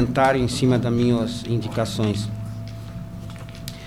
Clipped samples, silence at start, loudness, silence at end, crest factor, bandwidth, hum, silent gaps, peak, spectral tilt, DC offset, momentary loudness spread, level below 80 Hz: under 0.1%; 0 s; -22 LUFS; 0 s; 16 dB; 16 kHz; none; none; -6 dBFS; -6.5 dB/octave; 0.3%; 16 LU; -42 dBFS